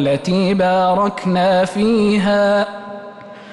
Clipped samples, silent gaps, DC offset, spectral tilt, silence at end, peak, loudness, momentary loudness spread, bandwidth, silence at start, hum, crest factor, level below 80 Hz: under 0.1%; none; under 0.1%; -6.5 dB/octave; 0 s; -6 dBFS; -15 LUFS; 18 LU; 11.5 kHz; 0 s; none; 10 dB; -50 dBFS